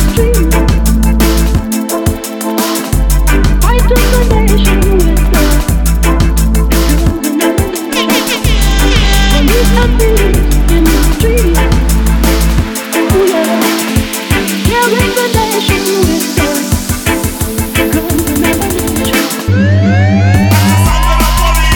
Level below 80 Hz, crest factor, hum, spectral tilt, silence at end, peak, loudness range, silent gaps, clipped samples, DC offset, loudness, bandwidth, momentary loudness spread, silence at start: -12 dBFS; 8 dB; none; -5 dB/octave; 0 s; 0 dBFS; 2 LU; none; under 0.1%; under 0.1%; -11 LUFS; 19.5 kHz; 4 LU; 0 s